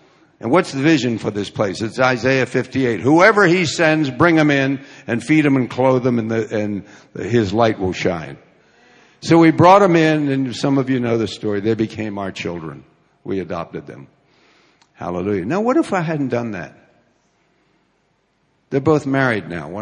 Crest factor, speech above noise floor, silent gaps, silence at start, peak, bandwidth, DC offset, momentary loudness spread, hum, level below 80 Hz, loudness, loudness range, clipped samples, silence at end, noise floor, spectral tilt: 18 dB; 47 dB; none; 0.4 s; 0 dBFS; 10.5 kHz; under 0.1%; 16 LU; none; -50 dBFS; -17 LUFS; 10 LU; under 0.1%; 0 s; -63 dBFS; -6 dB/octave